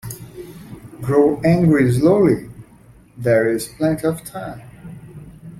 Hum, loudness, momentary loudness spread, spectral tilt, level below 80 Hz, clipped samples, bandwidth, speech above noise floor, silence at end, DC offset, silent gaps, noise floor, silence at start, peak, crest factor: none; -17 LUFS; 24 LU; -7.5 dB/octave; -48 dBFS; under 0.1%; 15.5 kHz; 31 dB; 0 s; under 0.1%; none; -47 dBFS; 0.05 s; -2 dBFS; 16 dB